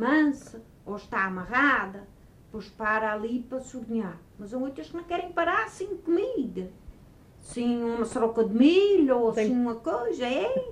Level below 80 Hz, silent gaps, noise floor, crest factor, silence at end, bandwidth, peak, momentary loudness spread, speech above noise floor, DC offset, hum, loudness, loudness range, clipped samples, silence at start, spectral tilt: -56 dBFS; none; -52 dBFS; 18 dB; 0 s; 11 kHz; -10 dBFS; 18 LU; 26 dB; under 0.1%; none; -26 LUFS; 7 LU; under 0.1%; 0 s; -5.5 dB/octave